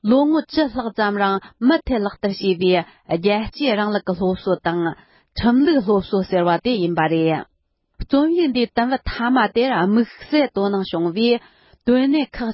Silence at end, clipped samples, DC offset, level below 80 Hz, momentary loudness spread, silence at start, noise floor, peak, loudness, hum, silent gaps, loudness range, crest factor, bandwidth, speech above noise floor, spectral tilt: 0 s; under 0.1%; under 0.1%; -42 dBFS; 6 LU; 0.05 s; -68 dBFS; -4 dBFS; -19 LUFS; none; none; 1 LU; 14 dB; 5.8 kHz; 49 dB; -10.5 dB/octave